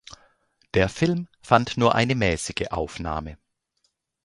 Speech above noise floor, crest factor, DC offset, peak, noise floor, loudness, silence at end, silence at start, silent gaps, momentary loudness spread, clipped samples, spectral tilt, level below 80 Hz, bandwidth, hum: 50 dB; 24 dB; under 0.1%; 0 dBFS; -73 dBFS; -24 LUFS; 0.9 s; 0.1 s; none; 10 LU; under 0.1%; -5.5 dB/octave; -44 dBFS; 11.5 kHz; none